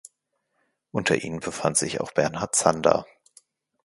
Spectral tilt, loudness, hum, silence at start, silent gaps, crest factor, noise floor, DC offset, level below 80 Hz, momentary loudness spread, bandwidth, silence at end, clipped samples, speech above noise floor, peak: -3.5 dB/octave; -24 LUFS; none; 0.95 s; none; 26 dB; -76 dBFS; under 0.1%; -58 dBFS; 7 LU; 11.5 kHz; 0.8 s; under 0.1%; 52 dB; 0 dBFS